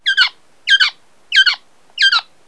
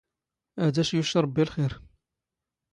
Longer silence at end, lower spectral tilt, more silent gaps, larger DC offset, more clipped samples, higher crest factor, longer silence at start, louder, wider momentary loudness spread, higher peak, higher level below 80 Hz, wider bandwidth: second, 0.25 s vs 0.9 s; second, 4.5 dB/octave vs -6 dB/octave; neither; first, 0.4% vs under 0.1%; neither; about the same, 16 dB vs 18 dB; second, 0.05 s vs 0.55 s; first, -13 LUFS vs -26 LUFS; about the same, 13 LU vs 13 LU; first, 0 dBFS vs -10 dBFS; second, -72 dBFS vs -56 dBFS; about the same, 11 kHz vs 11 kHz